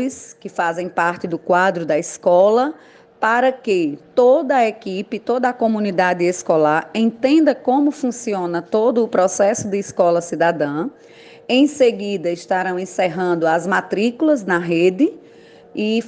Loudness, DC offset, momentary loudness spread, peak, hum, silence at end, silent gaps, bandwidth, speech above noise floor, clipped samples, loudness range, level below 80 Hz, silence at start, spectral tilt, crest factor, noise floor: -18 LUFS; under 0.1%; 8 LU; -4 dBFS; none; 0 s; none; 10 kHz; 27 dB; under 0.1%; 2 LU; -66 dBFS; 0 s; -5 dB/octave; 14 dB; -44 dBFS